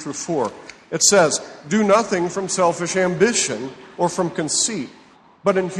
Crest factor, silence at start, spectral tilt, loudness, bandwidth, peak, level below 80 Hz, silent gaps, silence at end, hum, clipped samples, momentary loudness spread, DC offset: 18 dB; 0 s; -3 dB/octave; -19 LUFS; 12 kHz; -2 dBFS; -60 dBFS; none; 0 s; none; under 0.1%; 12 LU; under 0.1%